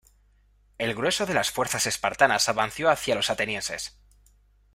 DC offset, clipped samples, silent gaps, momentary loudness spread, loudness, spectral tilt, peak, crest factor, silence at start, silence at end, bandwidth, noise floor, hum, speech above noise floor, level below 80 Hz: under 0.1%; under 0.1%; none; 10 LU; -25 LUFS; -2 dB/octave; -4 dBFS; 24 dB; 0.8 s; 0.85 s; 16 kHz; -61 dBFS; 50 Hz at -55 dBFS; 36 dB; -56 dBFS